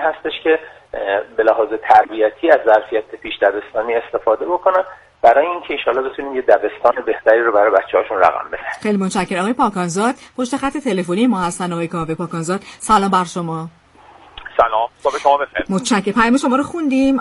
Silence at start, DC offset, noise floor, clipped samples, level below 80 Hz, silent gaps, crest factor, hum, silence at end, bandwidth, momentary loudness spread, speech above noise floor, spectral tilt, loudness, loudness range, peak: 0 s; under 0.1%; -45 dBFS; under 0.1%; -48 dBFS; none; 16 dB; none; 0 s; 11.5 kHz; 10 LU; 28 dB; -5 dB/octave; -17 LUFS; 4 LU; 0 dBFS